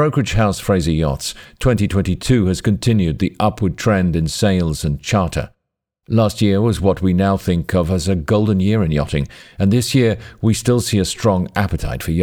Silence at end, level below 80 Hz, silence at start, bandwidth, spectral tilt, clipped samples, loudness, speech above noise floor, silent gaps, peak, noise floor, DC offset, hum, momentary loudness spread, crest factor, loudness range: 0 s; -32 dBFS; 0 s; 19 kHz; -6 dB/octave; under 0.1%; -17 LUFS; 60 dB; none; -2 dBFS; -76 dBFS; under 0.1%; none; 5 LU; 16 dB; 1 LU